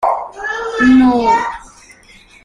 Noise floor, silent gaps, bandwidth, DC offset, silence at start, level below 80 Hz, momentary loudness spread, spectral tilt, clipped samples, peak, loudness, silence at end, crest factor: -44 dBFS; none; 10 kHz; under 0.1%; 0 s; -42 dBFS; 14 LU; -5 dB/octave; under 0.1%; -2 dBFS; -13 LUFS; 0.8 s; 12 dB